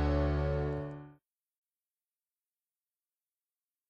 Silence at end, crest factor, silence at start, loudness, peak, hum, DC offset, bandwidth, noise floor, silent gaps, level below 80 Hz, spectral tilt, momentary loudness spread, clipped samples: 2.75 s; 18 dB; 0 s; -34 LUFS; -18 dBFS; none; under 0.1%; 5.8 kHz; under -90 dBFS; none; -42 dBFS; -9 dB/octave; 14 LU; under 0.1%